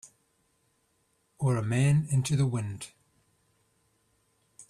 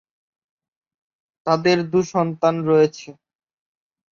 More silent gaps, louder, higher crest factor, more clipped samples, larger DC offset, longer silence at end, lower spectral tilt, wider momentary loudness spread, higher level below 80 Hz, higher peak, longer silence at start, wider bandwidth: neither; second, -28 LUFS vs -19 LUFS; about the same, 18 dB vs 18 dB; neither; neither; second, 0.05 s vs 1 s; about the same, -6.5 dB/octave vs -6 dB/octave; first, 15 LU vs 7 LU; about the same, -62 dBFS vs -62 dBFS; second, -14 dBFS vs -4 dBFS; second, 0.05 s vs 1.45 s; first, 12.5 kHz vs 7.4 kHz